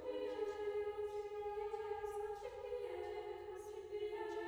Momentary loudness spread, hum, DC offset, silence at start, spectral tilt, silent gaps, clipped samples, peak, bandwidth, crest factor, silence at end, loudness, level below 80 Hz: 6 LU; none; under 0.1%; 0 s; -5 dB/octave; none; under 0.1%; -30 dBFS; over 20 kHz; 14 dB; 0 s; -45 LUFS; -68 dBFS